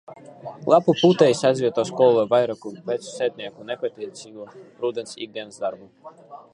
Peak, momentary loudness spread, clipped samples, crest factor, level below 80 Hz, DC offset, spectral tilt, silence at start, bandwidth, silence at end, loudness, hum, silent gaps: -2 dBFS; 23 LU; under 0.1%; 20 dB; -70 dBFS; under 0.1%; -5.5 dB/octave; 0.1 s; 11 kHz; 0.15 s; -21 LUFS; none; none